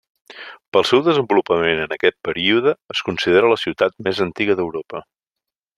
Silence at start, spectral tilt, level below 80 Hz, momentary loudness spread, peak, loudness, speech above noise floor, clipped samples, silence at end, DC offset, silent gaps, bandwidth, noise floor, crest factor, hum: 0.3 s; -5 dB/octave; -58 dBFS; 15 LU; -2 dBFS; -18 LUFS; 67 dB; under 0.1%; 0.75 s; under 0.1%; 0.68-0.72 s; 12 kHz; -85 dBFS; 18 dB; none